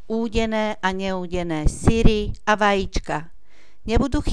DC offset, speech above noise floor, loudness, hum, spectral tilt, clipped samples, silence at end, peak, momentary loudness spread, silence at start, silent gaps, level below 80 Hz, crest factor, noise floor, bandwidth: 2%; 35 dB; -22 LUFS; none; -5.5 dB/octave; under 0.1%; 0 s; -2 dBFS; 8 LU; 0.1 s; none; -26 dBFS; 20 dB; -55 dBFS; 11 kHz